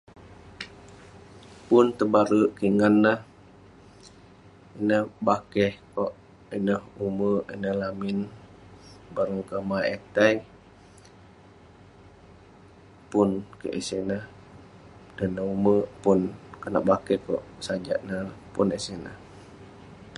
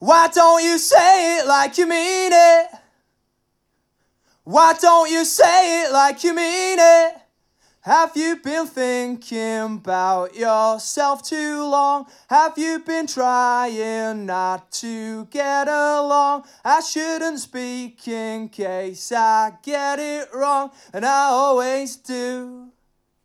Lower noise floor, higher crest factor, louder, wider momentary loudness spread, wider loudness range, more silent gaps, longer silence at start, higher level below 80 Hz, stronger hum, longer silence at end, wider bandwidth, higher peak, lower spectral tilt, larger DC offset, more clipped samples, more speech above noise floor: second, -52 dBFS vs -71 dBFS; first, 24 dB vs 16 dB; second, -26 LUFS vs -18 LUFS; first, 19 LU vs 15 LU; about the same, 8 LU vs 7 LU; neither; first, 0.2 s vs 0 s; first, -56 dBFS vs -74 dBFS; neither; second, 0 s vs 0.6 s; second, 11.5 kHz vs 15.5 kHz; about the same, -4 dBFS vs -2 dBFS; first, -6.5 dB/octave vs -2 dB/octave; neither; neither; second, 27 dB vs 53 dB